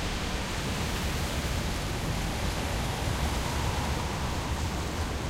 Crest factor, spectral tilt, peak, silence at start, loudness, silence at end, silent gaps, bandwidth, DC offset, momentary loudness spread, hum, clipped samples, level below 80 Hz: 14 dB; -4.5 dB/octave; -16 dBFS; 0 s; -31 LUFS; 0 s; none; 16 kHz; under 0.1%; 2 LU; none; under 0.1%; -36 dBFS